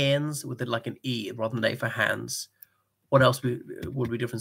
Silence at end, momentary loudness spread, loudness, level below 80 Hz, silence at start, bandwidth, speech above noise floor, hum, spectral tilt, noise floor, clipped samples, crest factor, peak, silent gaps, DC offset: 0 s; 12 LU; -28 LUFS; -60 dBFS; 0 s; 16 kHz; 30 dB; none; -5 dB/octave; -57 dBFS; under 0.1%; 22 dB; -6 dBFS; none; under 0.1%